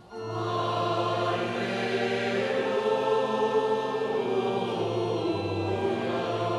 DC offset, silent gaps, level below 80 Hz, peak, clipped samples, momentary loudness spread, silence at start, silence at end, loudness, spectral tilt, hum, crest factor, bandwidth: under 0.1%; none; -68 dBFS; -14 dBFS; under 0.1%; 3 LU; 0 s; 0 s; -28 LUFS; -6 dB/octave; none; 14 dB; 12 kHz